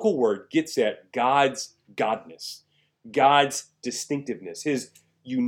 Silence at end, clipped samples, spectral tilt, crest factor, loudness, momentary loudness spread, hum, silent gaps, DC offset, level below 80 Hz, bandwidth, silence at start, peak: 0 s; under 0.1%; -3.5 dB/octave; 20 dB; -25 LUFS; 17 LU; none; none; under 0.1%; -78 dBFS; 17 kHz; 0 s; -6 dBFS